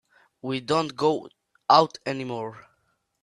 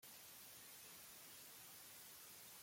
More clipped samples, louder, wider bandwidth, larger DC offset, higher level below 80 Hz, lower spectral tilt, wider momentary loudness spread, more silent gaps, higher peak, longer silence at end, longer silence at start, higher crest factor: neither; first, -25 LUFS vs -57 LUFS; second, 11.5 kHz vs 16.5 kHz; neither; first, -70 dBFS vs -90 dBFS; first, -5 dB/octave vs -0.5 dB/octave; first, 16 LU vs 0 LU; neither; first, -4 dBFS vs -48 dBFS; first, 0.65 s vs 0 s; first, 0.45 s vs 0 s; first, 22 dB vs 12 dB